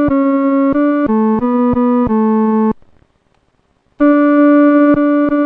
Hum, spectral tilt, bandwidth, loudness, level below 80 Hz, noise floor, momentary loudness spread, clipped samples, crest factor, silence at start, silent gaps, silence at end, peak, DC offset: none; -10.5 dB/octave; 3.7 kHz; -12 LUFS; -40 dBFS; -58 dBFS; 5 LU; under 0.1%; 10 dB; 0 s; none; 0 s; -2 dBFS; under 0.1%